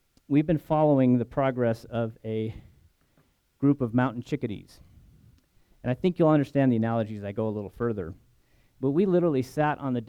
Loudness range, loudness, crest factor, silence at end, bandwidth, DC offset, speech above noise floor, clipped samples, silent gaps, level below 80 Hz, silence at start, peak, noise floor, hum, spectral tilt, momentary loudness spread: 4 LU; -26 LUFS; 18 dB; 0 s; 14 kHz; under 0.1%; 41 dB; under 0.1%; none; -56 dBFS; 0.3 s; -10 dBFS; -66 dBFS; none; -9 dB/octave; 10 LU